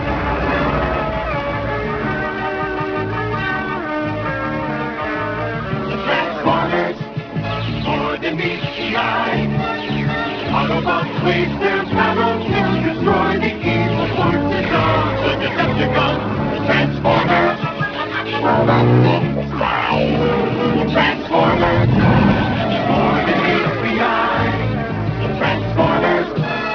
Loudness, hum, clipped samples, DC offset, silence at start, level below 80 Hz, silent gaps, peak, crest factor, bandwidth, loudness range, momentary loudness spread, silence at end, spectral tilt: -17 LUFS; none; under 0.1%; under 0.1%; 0 s; -36 dBFS; none; 0 dBFS; 16 dB; 5.4 kHz; 5 LU; 7 LU; 0 s; -7.5 dB/octave